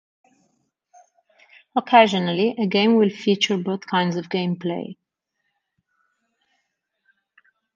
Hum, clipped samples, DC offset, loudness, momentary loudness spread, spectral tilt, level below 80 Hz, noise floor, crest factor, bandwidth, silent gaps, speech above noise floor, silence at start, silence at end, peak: none; under 0.1%; under 0.1%; -20 LUFS; 12 LU; -5.5 dB/octave; -72 dBFS; -77 dBFS; 20 dB; 7.4 kHz; none; 57 dB; 1.75 s; 2.8 s; -2 dBFS